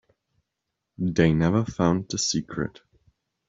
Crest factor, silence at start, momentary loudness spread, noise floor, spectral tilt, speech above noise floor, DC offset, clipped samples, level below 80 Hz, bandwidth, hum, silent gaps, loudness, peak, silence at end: 20 dB; 1 s; 11 LU; -82 dBFS; -5 dB/octave; 59 dB; under 0.1%; under 0.1%; -50 dBFS; 7.8 kHz; none; none; -24 LUFS; -6 dBFS; 0.8 s